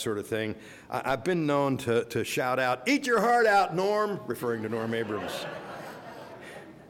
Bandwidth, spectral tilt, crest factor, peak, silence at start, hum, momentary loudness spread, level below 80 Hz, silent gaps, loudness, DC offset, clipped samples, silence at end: 17.5 kHz; -5 dB/octave; 14 dB; -14 dBFS; 0 s; none; 20 LU; -64 dBFS; none; -28 LUFS; under 0.1%; under 0.1%; 0 s